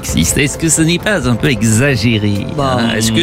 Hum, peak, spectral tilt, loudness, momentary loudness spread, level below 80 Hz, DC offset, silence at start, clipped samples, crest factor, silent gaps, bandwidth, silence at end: none; 0 dBFS; -4 dB/octave; -13 LUFS; 4 LU; -30 dBFS; 0.6%; 0 s; under 0.1%; 12 dB; none; 16 kHz; 0 s